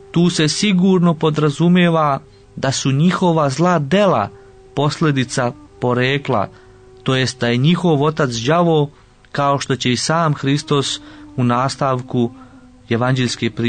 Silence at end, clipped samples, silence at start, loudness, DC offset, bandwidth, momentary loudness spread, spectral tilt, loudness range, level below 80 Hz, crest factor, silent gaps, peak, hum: 0 s; under 0.1%; 0.15 s; -17 LUFS; 0.1%; 9.6 kHz; 9 LU; -5.5 dB/octave; 4 LU; -50 dBFS; 12 dB; none; -4 dBFS; none